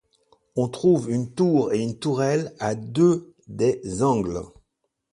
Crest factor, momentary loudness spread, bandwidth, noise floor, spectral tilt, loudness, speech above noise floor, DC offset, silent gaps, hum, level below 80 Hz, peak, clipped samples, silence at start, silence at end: 16 dB; 10 LU; 11.5 kHz; -76 dBFS; -7 dB/octave; -23 LUFS; 54 dB; under 0.1%; none; none; -54 dBFS; -8 dBFS; under 0.1%; 0.55 s; 0.65 s